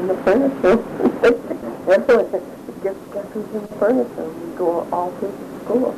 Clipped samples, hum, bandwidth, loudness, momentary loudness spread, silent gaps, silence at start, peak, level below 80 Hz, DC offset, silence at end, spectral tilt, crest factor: under 0.1%; none; 13.5 kHz; -20 LUFS; 13 LU; none; 0 s; -6 dBFS; -50 dBFS; under 0.1%; 0 s; -6.5 dB/octave; 14 dB